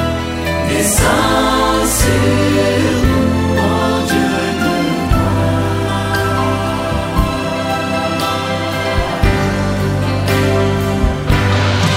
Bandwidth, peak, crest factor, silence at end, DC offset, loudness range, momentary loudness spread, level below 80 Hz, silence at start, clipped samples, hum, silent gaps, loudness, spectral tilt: 16.5 kHz; 0 dBFS; 14 dB; 0 s; under 0.1%; 3 LU; 5 LU; -24 dBFS; 0 s; under 0.1%; none; none; -15 LUFS; -5 dB/octave